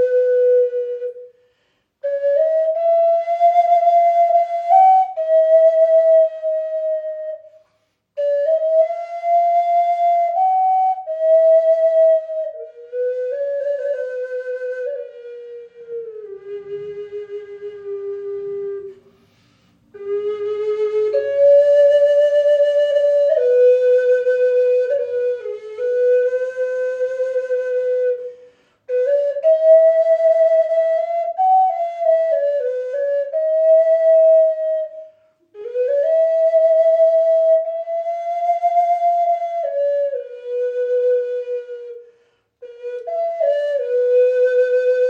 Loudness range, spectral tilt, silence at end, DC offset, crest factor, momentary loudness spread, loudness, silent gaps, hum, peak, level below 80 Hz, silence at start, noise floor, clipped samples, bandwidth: 12 LU; -3.5 dB/octave; 0 s; under 0.1%; 14 dB; 17 LU; -17 LUFS; none; none; -2 dBFS; -78 dBFS; 0 s; -66 dBFS; under 0.1%; 6.6 kHz